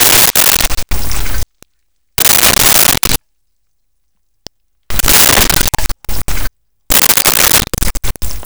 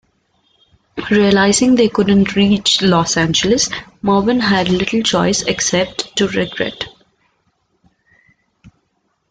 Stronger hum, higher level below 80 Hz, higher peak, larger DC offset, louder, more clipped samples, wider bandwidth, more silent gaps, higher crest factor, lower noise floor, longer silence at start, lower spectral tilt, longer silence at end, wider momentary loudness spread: neither; first, -24 dBFS vs -44 dBFS; about the same, 0 dBFS vs -2 dBFS; neither; first, -8 LUFS vs -14 LUFS; neither; first, over 20 kHz vs 9.6 kHz; neither; about the same, 12 dB vs 14 dB; about the same, -68 dBFS vs -66 dBFS; second, 0 s vs 0.95 s; second, -1 dB/octave vs -4 dB/octave; second, 0 s vs 0.6 s; first, 16 LU vs 10 LU